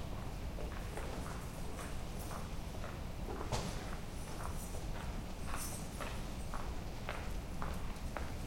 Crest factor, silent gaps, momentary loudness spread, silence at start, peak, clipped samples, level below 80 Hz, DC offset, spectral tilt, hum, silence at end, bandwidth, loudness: 18 dB; none; 3 LU; 0 s; -22 dBFS; under 0.1%; -46 dBFS; under 0.1%; -5 dB/octave; none; 0 s; 16.5 kHz; -44 LUFS